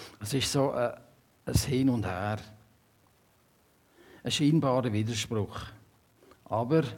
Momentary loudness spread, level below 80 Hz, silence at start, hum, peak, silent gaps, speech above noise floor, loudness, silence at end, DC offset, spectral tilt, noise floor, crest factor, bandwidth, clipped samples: 14 LU; -52 dBFS; 0 s; none; -12 dBFS; none; 37 dB; -29 LUFS; 0 s; under 0.1%; -5.5 dB/octave; -65 dBFS; 20 dB; 18 kHz; under 0.1%